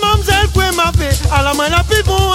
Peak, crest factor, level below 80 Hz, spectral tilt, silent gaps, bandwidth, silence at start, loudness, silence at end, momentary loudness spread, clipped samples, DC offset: 0 dBFS; 12 dB; -18 dBFS; -4 dB/octave; none; 16.5 kHz; 0 s; -13 LUFS; 0 s; 2 LU; under 0.1%; under 0.1%